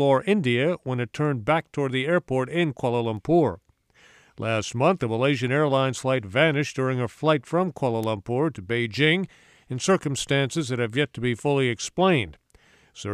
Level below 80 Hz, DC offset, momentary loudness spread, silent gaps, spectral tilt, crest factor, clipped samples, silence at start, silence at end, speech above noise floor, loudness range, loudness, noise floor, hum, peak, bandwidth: -58 dBFS; under 0.1%; 6 LU; none; -5.5 dB/octave; 18 dB; under 0.1%; 0 s; 0 s; 34 dB; 2 LU; -24 LUFS; -58 dBFS; none; -6 dBFS; 13 kHz